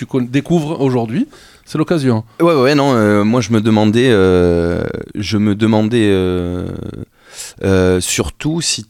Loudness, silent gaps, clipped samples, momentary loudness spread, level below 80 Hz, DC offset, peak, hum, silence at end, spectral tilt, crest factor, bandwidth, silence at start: -14 LUFS; none; under 0.1%; 13 LU; -40 dBFS; under 0.1%; 0 dBFS; none; 0.05 s; -5.5 dB/octave; 14 dB; 16 kHz; 0 s